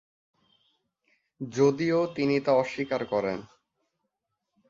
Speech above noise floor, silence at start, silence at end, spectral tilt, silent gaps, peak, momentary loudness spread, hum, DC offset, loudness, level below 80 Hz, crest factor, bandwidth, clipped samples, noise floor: 57 dB; 1.4 s; 1.25 s; -6.5 dB/octave; none; -10 dBFS; 12 LU; none; under 0.1%; -27 LUFS; -68 dBFS; 20 dB; 7.6 kHz; under 0.1%; -83 dBFS